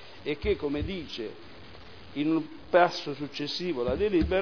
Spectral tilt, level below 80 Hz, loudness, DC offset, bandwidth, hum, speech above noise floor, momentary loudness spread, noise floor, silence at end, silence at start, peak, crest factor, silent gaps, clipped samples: -6 dB/octave; -44 dBFS; -29 LUFS; 0.4%; 5.4 kHz; none; 20 dB; 24 LU; -48 dBFS; 0 s; 0 s; -8 dBFS; 22 dB; none; under 0.1%